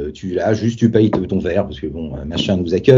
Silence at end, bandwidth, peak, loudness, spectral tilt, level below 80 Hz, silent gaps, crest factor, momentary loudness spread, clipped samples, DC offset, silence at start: 0 s; 7.6 kHz; 0 dBFS; -18 LUFS; -7 dB/octave; -38 dBFS; none; 16 dB; 11 LU; under 0.1%; under 0.1%; 0 s